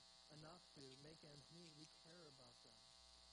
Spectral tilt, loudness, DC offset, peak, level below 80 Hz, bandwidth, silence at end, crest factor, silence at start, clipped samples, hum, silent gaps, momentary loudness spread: -3.5 dB/octave; -63 LUFS; under 0.1%; -46 dBFS; -84 dBFS; 10 kHz; 0 s; 18 dB; 0 s; under 0.1%; none; none; 4 LU